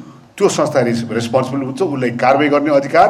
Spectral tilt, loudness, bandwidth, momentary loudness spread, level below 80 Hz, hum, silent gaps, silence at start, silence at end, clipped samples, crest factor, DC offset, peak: -5.5 dB/octave; -15 LUFS; 13.5 kHz; 6 LU; -56 dBFS; none; none; 0 s; 0 s; under 0.1%; 14 dB; under 0.1%; 0 dBFS